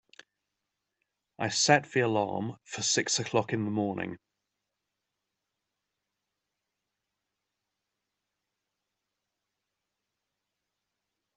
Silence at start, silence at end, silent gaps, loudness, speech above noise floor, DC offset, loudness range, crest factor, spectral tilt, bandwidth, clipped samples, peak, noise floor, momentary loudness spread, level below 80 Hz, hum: 1.4 s; 7.2 s; none; -28 LUFS; 57 dB; under 0.1%; 11 LU; 28 dB; -3 dB/octave; 8.4 kHz; under 0.1%; -6 dBFS; -86 dBFS; 14 LU; -76 dBFS; none